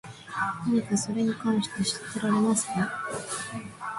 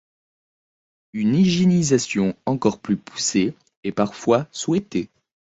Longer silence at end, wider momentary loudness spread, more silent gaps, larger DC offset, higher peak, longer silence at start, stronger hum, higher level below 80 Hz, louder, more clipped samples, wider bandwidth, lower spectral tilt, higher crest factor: second, 0 s vs 0.5 s; about the same, 9 LU vs 11 LU; second, none vs 3.77-3.83 s; neither; second, -14 dBFS vs -4 dBFS; second, 0.05 s vs 1.15 s; neither; second, -62 dBFS vs -56 dBFS; second, -28 LUFS vs -21 LUFS; neither; first, 11.5 kHz vs 8 kHz; second, -4 dB/octave vs -5.5 dB/octave; about the same, 14 dB vs 18 dB